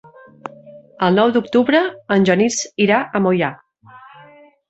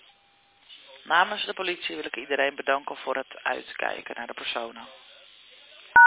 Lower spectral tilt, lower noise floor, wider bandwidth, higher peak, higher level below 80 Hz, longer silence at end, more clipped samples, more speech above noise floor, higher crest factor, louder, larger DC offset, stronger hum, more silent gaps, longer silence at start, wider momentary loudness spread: first, -5 dB/octave vs 1.5 dB/octave; second, -46 dBFS vs -62 dBFS; first, 8.2 kHz vs 4 kHz; about the same, -2 dBFS vs -4 dBFS; first, -60 dBFS vs -68 dBFS; first, 0.75 s vs 0 s; neither; about the same, 30 dB vs 33 dB; second, 16 dB vs 22 dB; first, -16 LUFS vs -28 LUFS; neither; neither; neither; second, 0.45 s vs 0.7 s; second, 20 LU vs 25 LU